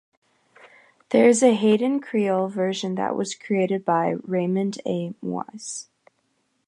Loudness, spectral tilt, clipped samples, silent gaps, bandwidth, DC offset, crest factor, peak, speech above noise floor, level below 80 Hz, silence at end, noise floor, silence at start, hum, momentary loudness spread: -23 LUFS; -5.5 dB/octave; under 0.1%; none; 11 kHz; under 0.1%; 20 dB; -4 dBFS; 48 dB; -74 dBFS; 0.85 s; -70 dBFS; 1.1 s; none; 13 LU